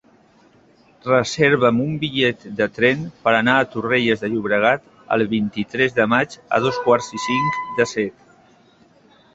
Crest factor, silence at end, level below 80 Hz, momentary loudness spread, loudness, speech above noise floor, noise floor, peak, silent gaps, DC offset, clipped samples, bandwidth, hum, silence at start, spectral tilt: 18 dB; 1.25 s; -56 dBFS; 7 LU; -19 LUFS; 34 dB; -53 dBFS; -2 dBFS; none; under 0.1%; under 0.1%; 8 kHz; none; 1.05 s; -5 dB/octave